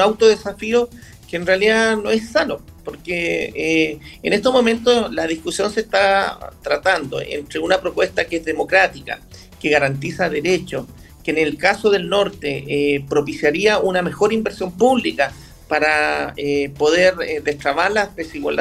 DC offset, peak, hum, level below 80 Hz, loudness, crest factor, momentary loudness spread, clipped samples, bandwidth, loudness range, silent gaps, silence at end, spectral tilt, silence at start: under 0.1%; 0 dBFS; none; -46 dBFS; -18 LUFS; 18 dB; 10 LU; under 0.1%; 15 kHz; 2 LU; none; 0 s; -4 dB/octave; 0 s